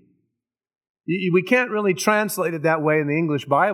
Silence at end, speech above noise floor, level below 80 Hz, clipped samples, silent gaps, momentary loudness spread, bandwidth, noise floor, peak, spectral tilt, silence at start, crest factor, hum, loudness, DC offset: 0 s; 59 dB; -78 dBFS; under 0.1%; none; 6 LU; 17.5 kHz; -79 dBFS; -2 dBFS; -5.5 dB/octave; 1.1 s; 20 dB; none; -20 LUFS; under 0.1%